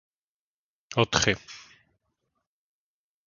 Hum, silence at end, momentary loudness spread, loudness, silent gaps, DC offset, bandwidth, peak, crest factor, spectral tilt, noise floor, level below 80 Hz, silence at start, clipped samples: none; 1.65 s; 22 LU; -25 LUFS; none; under 0.1%; 7.4 kHz; -6 dBFS; 28 dB; -3 dB/octave; under -90 dBFS; -54 dBFS; 0.9 s; under 0.1%